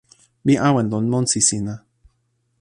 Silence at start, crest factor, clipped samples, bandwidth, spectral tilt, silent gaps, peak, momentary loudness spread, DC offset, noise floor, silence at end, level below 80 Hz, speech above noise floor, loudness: 0.45 s; 20 dB; under 0.1%; 11.5 kHz; -4.5 dB/octave; none; 0 dBFS; 12 LU; under 0.1%; -68 dBFS; 0.8 s; -54 dBFS; 50 dB; -19 LUFS